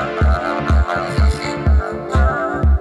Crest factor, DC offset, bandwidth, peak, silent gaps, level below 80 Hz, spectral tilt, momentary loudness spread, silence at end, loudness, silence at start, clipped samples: 10 dB; under 0.1%; 10.5 kHz; -4 dBFS; none; -18 dBFS; -7 dB/octave; 2 LU; 0 s; -18 LUFS; 0 s; under 0.1%